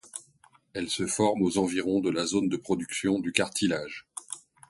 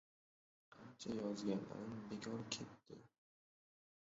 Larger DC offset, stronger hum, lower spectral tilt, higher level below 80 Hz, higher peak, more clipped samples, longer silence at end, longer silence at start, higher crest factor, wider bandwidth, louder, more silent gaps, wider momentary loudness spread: neither; neither; about the same, -4 dB/octave vs -5 dB/octave; first, -60 dBFS vs -80 dBFS; first, -4 dBFS vs -26 dBFS; neither; second, 0.3 s vs 1.05 s; second, 0.05 s vs 0.7 s; about the same, 26 dB vs 22 dB; first, 12 kHz vs 7.6 kHz; first, -28 LUFS vs -47 LUFS; neither; second, 14 LU vs 18 LU